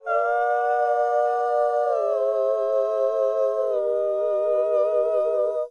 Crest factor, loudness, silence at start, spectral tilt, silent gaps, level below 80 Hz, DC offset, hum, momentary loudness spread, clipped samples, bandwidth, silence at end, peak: 10 dB; -22 LUFS; 0.05 s; -3.5 dB/octave; none; -72 dBFS; under 0.1%; none; 2 LU; under 0.1%; 8.8 kHz; 0 s; -12 dBFS